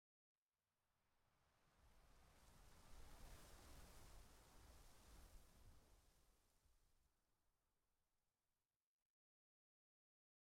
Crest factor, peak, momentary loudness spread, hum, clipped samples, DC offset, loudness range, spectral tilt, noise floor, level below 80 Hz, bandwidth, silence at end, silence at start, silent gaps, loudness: 20 dB; -50 dBFS; 4 LU; none; under 0.1%; under 0.1%; 1 LU; -3.5 dB/octave; under -90 dBFS; -72 dBFS; 16.5 kHz; 2.25 s; 0.85 s; none; -68 LUFS